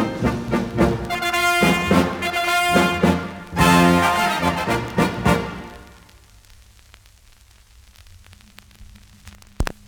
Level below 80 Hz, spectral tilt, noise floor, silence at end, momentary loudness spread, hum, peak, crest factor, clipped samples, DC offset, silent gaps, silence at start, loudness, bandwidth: -38 dBFS; -5 dB/octave; -50 dBFS; 0.15 s; 11 LU; none; -2 dBFS; 18 dB; under 0.1%; under 0.1%; none; 0 s; -19 LUFS; over 20 kHz